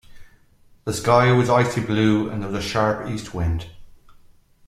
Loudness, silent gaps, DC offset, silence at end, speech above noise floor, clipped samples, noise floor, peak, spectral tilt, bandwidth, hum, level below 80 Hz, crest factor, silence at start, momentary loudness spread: -21 LUFS; none; under 0.1%; 0.8 s; 34 dB; under 0.1%; -54 dBFS; -2 dBFS; -6 dB/octave; 14 kHz; none; -44 dBFS; 20 dB; 0.1 s; 13 LU